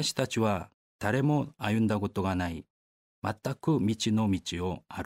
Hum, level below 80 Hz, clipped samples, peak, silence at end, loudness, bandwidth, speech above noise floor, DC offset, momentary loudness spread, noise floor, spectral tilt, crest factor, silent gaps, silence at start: none; -56 dBFS; under 0.1%; -12 dBFS; 0 s; -30 LUFS; 16 kHz; over 61 dB; under 0.1%; 8 LU; under -90 dBFS; -5.5 dB/octave; 18 dB; 0.74-0.99 s, 2.70-3.22 s; 0 s